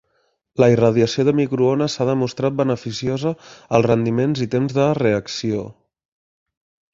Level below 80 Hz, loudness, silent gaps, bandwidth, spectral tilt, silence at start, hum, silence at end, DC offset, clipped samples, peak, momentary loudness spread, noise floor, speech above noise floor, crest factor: -54 dBFS; -19 LUFS; none; 7.8 kHz; -6.5 dB/octave; 0.6 s; none; 1.2 s; under 0.1%; under 0.1%; 0 dBFS; 8 LU; -67 dBFS; 48 dB; 18 dB